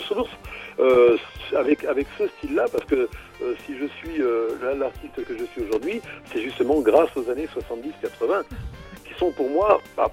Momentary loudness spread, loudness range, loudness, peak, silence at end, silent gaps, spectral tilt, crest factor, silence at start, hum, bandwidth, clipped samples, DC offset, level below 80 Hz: 14 LU; 5 LU; -23 LUFS; -4 dBFS; 0 s; none; -6 dB/octave; 20 dB; 0 s; none; 16 kHz; under 0.1%; under 0.1%; -46 dBFS